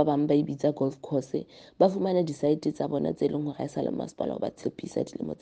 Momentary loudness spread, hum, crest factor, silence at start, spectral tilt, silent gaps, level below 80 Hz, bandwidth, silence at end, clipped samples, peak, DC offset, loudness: 9 LU; none; 20 dB; 0 s; -7.5 dB/octave; none; -64 dBFS; 9.2 kHz; 0.05 s; under 0.1%; -8 dBFS; under 0.1%; -29 LUFS